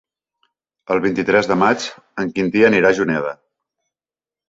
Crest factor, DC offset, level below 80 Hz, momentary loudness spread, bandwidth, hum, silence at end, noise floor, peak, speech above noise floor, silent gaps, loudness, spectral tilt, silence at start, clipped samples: 18 dB; under 0.1%; -56 dBFS; 13 LU; 7.8 kHz; none; 1.15 s; under -90 dBFS; -2 dBFS; over 73 dB; none; -17 LUFS; -5.5 dB/octave; 0.9 s; under 0.1%